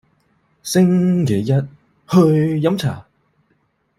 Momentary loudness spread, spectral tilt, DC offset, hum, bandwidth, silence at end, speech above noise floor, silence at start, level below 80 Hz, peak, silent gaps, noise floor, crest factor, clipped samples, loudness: 15 LU; -7 dB/octave; under 0.1%; none; 15.5 kHz; 0.95 s; 49 dB; 0.65 s; -54 dBFS; -2 dBFS; none; -64 dBFS; 16 dB; under 0.1%; -17 LUFS